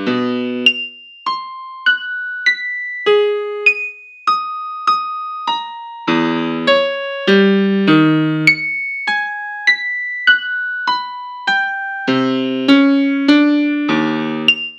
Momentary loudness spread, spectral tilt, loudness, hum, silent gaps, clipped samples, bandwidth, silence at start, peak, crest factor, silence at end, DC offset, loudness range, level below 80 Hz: 11 LU; -5.5 dB/octave; -15 LUFS; none; none; under 0.1%; 9.4 kHz; 0 s; 0 dBFS; 16 dB; 0 s; under 0.1%; 4 LU; -72 dBFS